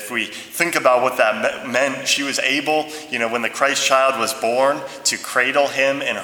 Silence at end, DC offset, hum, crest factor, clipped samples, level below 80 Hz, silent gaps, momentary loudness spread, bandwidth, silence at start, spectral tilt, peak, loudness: 0 s; under 0.1%; none; 18 dB; under 0.1%; -68 dBFS; none; 7 LU; over 20 kHz; 0 s; -1.5 dB/octave; 0 dBFS; -18 LUFS